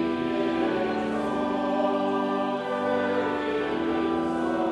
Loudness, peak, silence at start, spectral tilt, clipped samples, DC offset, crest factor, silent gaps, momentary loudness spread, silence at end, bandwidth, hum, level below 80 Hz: -26 LUFS; -12 dBFS; 0 s; -6.5 dB/octave; under 0.1%; under 0.1%; 14 dB; none; 2 LU; 0 s; 11.5 kHz; none; -58 dBFS